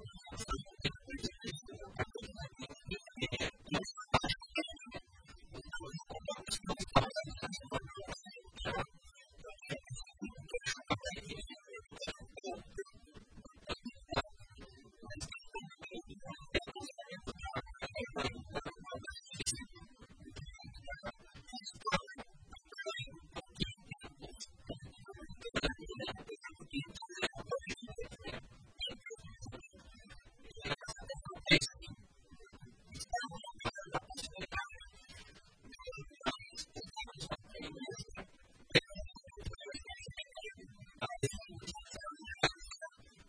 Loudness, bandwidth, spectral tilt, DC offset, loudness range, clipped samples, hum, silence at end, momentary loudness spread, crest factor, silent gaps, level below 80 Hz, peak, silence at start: -42 LUFS; 10.5 kHz; -3.5 dB/octave; under 0.1%; 8 LU; under 0.1%; none; 0 s; 17 LU; 32 dB; none; -56 dBFS; -12 dBFS; 0 s